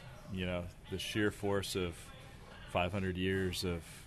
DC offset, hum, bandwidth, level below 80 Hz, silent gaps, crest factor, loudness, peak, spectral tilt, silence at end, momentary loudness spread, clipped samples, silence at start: under 0.1%; none; 13.5 kHz; -56 dBFS; none; 18 dB; -37 LUFS; -20 dBFS; -5 dB/octave; 0 s; 16 LU; under 0.1%; 0 s